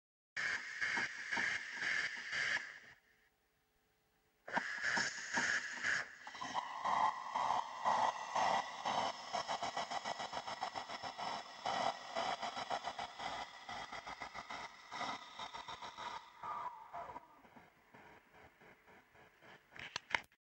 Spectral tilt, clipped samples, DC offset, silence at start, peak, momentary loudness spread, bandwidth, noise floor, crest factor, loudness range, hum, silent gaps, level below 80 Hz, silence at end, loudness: -1.5 dB/octave; under 0.1%; under 0.1%; 0.35 s; -16 dBFS; 12 LU; 16 kHz; -79 dBFS; 26 dB; 12 LU; none; none; -76 dBFS; 0.3 s; -40 LUFS